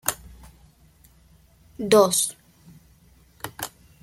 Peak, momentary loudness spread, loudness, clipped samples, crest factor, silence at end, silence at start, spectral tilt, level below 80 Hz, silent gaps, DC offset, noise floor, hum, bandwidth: -2 dBFS; 22 LU; -22 LUFS; under 0.1%; 24 dB; 0.35 s; 0.05 s; -3 dB/octave; -54 dBFS; none; under 0.1%; -56 dBFS; none; 16.5 kHz